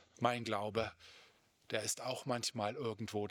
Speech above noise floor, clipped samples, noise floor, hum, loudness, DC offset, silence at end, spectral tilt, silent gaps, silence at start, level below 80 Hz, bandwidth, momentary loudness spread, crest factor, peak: 28 dB; under 0.1%; -68 dBFS; none; -39 LUFS; under 0.1%; 0 s; -3.5 dB/octave; none; 0.2 s; -76 dBFS; 20 kHz; 7 LU; 24 dB; -16 dBFS